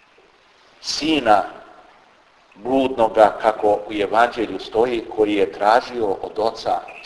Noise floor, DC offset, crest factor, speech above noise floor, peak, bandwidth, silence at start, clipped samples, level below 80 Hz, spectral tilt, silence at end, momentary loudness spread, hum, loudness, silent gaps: -53 dBFS; under 0.1%; 20 dB; 35 dB; 0 dBFS; 11 kHz; 0.85 s; under 0.1%; -52 dBFS; -4 dB/octave; 0 s; 9 LU; none; -19 LUFS; none